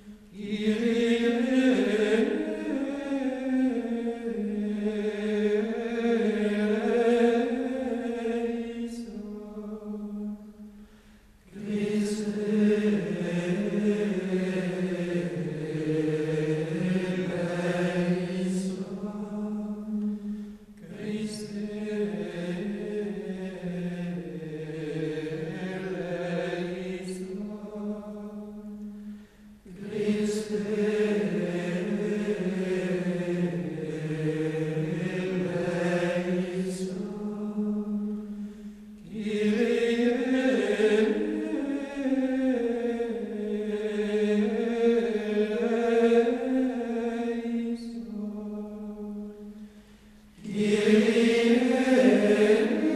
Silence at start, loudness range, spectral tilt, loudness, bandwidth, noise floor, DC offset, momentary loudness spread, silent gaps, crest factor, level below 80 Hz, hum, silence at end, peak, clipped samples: 0 s; 8 LU; -6.5 dB/octave; -28 LUFS; 12.5 kHz; -55 dBFS; under 0.1%; 14 LU; none; 18 dB; -60 dBFS; none; 0 s; -8 dBFS; under 0.1%